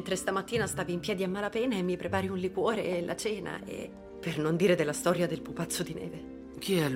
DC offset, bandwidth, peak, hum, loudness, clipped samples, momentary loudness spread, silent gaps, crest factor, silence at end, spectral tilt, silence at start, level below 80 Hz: under 0.1%; 16 kHz; -14 dBFS; none; -31 LUFS; under 0.1%; 12 LU; none; 18 dB; 0 s; -5 dB/octave; 0 s; -58 dBFS